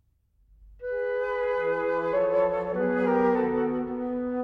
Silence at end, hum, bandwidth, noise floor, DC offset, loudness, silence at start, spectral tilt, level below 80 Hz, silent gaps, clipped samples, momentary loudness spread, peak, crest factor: 0 s; none; 5.4 kHz; -65 dBFS; under 0.1%; -26 LUFS; 0.6 s; -8.5 dB/octave; -56 dBFS; none; under 0.1%; 7 LU; -12 dBFS; 14 dB